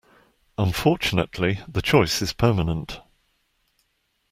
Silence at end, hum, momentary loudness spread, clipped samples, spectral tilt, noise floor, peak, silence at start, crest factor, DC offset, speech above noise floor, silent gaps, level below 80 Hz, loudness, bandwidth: 1.3 s; none; 13 LU; under 0.1%; -5.5 dB/octave; -71 dBFS; -4 dBFS; 0.6 s; 20 dB; under 0.1%; 49 dB; none; -44 dBFS; -22 LUFS; 16 kHz